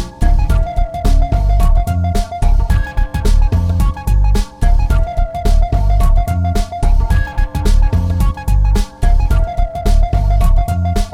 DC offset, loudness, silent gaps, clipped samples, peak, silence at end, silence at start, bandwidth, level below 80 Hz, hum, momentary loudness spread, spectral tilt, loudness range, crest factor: 0.6%; -16 LUFS; none; under 0.1%; -2 dBFS; 0 s; 0 s; 13.5 kHz; -12 dBFS; none; 4 LU; -7 dB/octave; 0 LU; 10 dB